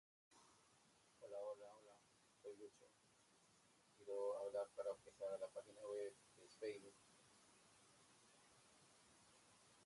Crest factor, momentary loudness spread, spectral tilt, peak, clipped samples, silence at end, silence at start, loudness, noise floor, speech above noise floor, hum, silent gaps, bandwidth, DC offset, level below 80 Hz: 18 dB; 18 LU; -3.5 dB/octave; -36 dBFS; under 0.1%; 0 s; 0.3 s; -52 LUFS; -75 dBFS; 25 dB; none; none; 11.5 kHz; under 0.1%; under -90 dBFS